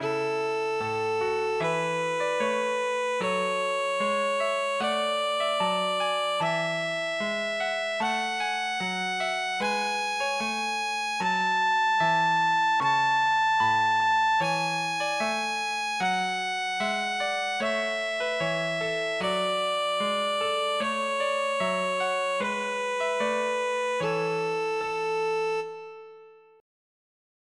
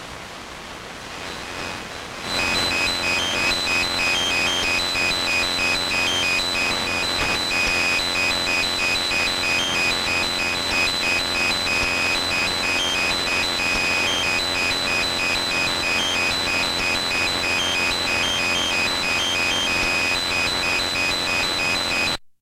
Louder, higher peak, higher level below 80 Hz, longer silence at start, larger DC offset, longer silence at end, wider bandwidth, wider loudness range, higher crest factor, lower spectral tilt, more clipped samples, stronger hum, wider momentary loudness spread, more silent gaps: second, -26 LUFS vs -19 LUFS; second, -14 dBFS vs -8 dBFS; second, -72 dBFS vs -44 dBFS; about the same, 0 s vs 0 s; neither; first, 1.25 s vs 0.1 s; second, 13 kHz vs 16 kHz; first, 4 LU vs 1 LU; about the same, 12 dB vs 14 dB; first, -3 dB/octave vs -1.5 dB/octave; neither; neither; about the same, 5 LU vs 4 LU; neither